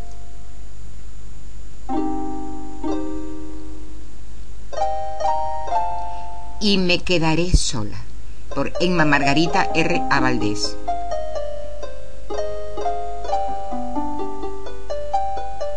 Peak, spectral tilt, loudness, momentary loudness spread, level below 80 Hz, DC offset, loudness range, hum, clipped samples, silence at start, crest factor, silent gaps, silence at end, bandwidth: -2 dBFS; -4.5 dB/octave; -23 LUFS; 23 LU; -34 dBFS; 10%; 10 LU; 50 Hz at -40 dBFS; under 0.1%; 0 s; 22 dB; none; 0 s; 10.5 kHz